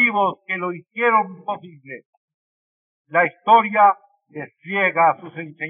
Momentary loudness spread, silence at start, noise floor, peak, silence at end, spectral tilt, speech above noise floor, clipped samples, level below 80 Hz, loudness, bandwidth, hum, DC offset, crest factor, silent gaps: 21 LU; 0 s; under -90 dBFS; -2 dBFS; 0 s; -2.5 dB/octave; over 70 dB; under 0.1%; under -90 dBFS; -18 LUFS; 3.7 kHz; none; under 0.1%; 18 dB; 2.05-2.28 s, 2.34-3.05 s